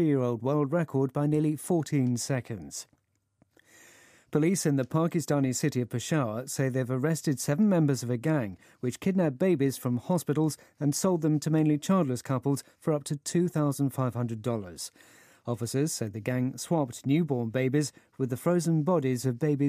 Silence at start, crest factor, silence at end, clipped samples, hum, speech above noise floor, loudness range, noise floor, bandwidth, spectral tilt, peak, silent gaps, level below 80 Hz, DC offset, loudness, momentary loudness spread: 0 s; 16 dB; 0 s; under 0.1%; none; 42 dB; 4 LU; -70 dBFS; 15.5 kHz; -6.5 dB/octave; -12 dBFS; none; -70 dBFS; under 0.1%; -28 LUFS; 7 LU